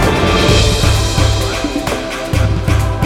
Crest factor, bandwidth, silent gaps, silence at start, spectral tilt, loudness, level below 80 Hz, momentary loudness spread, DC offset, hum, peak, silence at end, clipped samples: 12 dB; 16.5 kHz; none; 0 s; -5 dB/octave; -14 LUFS; -20 dBFS; 7 LU; under 0.1%; none; 0 dBFS; 0 s; under 0.1%